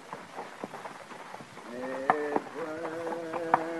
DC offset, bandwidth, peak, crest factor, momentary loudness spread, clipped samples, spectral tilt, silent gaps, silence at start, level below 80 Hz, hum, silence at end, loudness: under 0.1%; 12.5 kHz; -6 dBFS; 28 dB; 15 LU; under 0.1%; -5 dB/octave; none; 0 s; -78 dBFS; none; 0 s; -35 LUFS